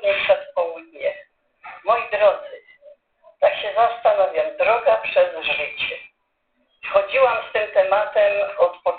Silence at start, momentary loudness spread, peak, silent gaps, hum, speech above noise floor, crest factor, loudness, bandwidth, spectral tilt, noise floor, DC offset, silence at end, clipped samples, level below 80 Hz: 0 s; 10 LU; -4 dBFS; none; none; 50 dB; 18 dB; -20 LUFS; 4.6 kHz; -6.5 dB/octave; -70 dBFS; under 0.1%; 0 s; under 0.1%; -60 dBFS